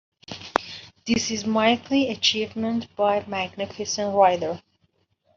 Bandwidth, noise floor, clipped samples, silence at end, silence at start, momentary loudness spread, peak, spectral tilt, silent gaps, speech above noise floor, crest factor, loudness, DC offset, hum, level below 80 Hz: 7.6 kHz; -68 dBFS; under 0.1%; 0.8 s; 0.3 s; 14 LU; 0 dBFS; -3.5 dB/octave; none; 45 dB; 24 dB; -23 LUFS; under 0.1%; none; -60 dBFS